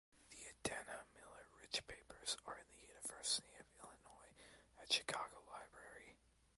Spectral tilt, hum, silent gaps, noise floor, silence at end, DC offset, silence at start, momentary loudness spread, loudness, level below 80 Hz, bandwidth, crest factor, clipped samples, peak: -0.5 dB/octave; none; none; -70 dBFS; 0.4 s; under 0.1%; 0.15 s; 23 LU; -46 LUFS; -74 dBFS; 16 kHz; 26 dB; under 0.1%; -24 dBFS